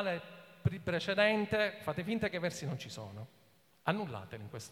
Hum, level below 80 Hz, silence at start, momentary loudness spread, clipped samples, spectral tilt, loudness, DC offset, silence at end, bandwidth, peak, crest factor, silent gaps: none; -64 dBFS; 0 s; 17 LU; under 0.1%; -5.5 dB/octave; -35 LUFS; under 0.1%; 0 s; 16.5 kHz; -14 dBFS; 22 dB; none